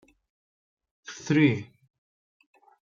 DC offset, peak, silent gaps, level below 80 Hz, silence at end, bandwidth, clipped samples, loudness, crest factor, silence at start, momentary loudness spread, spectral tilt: under 0.1%; -8 dBFS; none; -72 dBFS; 1.35 s; 7.4 kHz; under 0.1%; -24 LUFS; 22 dB; 1.1 s; 26 LU; -6.5 dB/octave